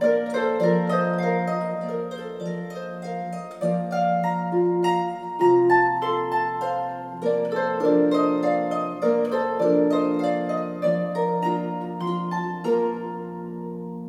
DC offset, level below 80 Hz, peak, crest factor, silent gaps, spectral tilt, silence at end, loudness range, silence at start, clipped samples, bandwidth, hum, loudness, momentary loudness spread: under 0.1%; -76 dBFS; -6 dBFS; 16 dB; none; -7.5 dB/octave; 0 s; 5 LU; 0 s; under 0.1%; 11.5 kHz; none; -24 LUFS; 12 LU